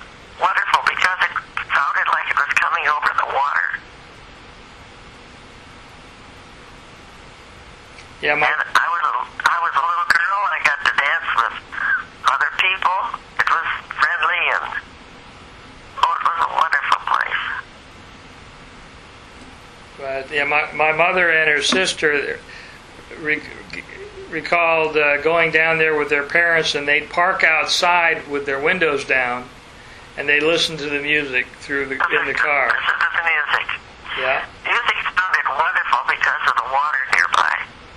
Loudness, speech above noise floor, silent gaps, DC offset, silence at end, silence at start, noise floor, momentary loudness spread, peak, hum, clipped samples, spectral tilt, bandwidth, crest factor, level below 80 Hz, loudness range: -18 LUFS; 23 dB; none; under 0.1%; 0 s; 0 s; -41 dBFS; 11 LU; 0 dBFS; none; under 0.1%; -2.5 dB/octave; 13 kHz; 20 dB; -50 dBFS; 6 LU